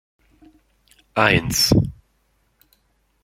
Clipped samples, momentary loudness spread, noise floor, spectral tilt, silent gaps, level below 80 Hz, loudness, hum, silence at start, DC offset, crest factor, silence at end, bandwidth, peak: under 0.1%; 11 LU; -65 dBFS; -4 dB/octave; none; -40 dBFS; -18 LUFS; none; 1.15 s; under 0.1%; 22 dB; 1.3 s; 16.5 kHz; 0 dBFS